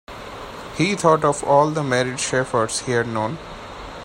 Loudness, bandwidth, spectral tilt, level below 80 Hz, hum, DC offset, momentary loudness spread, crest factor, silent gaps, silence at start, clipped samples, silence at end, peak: -20 LUFS; 16 kHz; -4.5 dB/octave; -48 dBFS; none; under 0.1%; 18 LU; 20 dB; none; 0.1 s; under 0.1%; 0 s; -2 dBFS